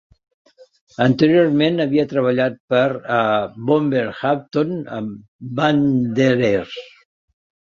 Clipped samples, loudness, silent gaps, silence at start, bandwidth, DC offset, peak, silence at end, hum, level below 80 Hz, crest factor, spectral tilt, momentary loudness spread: under 0.1%; -18 LUFS; 2.60-2.68 s, 5.28-5.39 s; 1 s; 7.2 kHz; under 0.1%; -2 dBFS; 0.8 s; none; -58 dBFS; 16 dB; -7.5 dB/octave; 14 LU